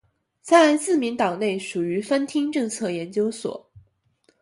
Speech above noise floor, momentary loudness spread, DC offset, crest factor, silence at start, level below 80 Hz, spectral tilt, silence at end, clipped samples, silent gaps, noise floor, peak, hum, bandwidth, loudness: 43 dB; 14 LU; under 0.1%; 20 dB; 0.45 s; -68 dBFS; -4.5 dB/octave; 0.65 s; under 0.1%; none; -65 dBFS; -2 dBFS; none; 11.5 kHz; -22 LUFS